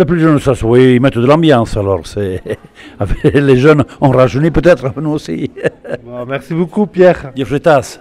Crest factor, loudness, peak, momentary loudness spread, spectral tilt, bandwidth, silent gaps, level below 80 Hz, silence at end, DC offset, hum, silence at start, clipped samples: 12 dB; -11 LUFS; 0 dBFS; 13 LU; -7.5 dB/octave; 13 kHz; none; -30 dBFS; 0.05 s; under 0.1%; none; 0 s; 0.4%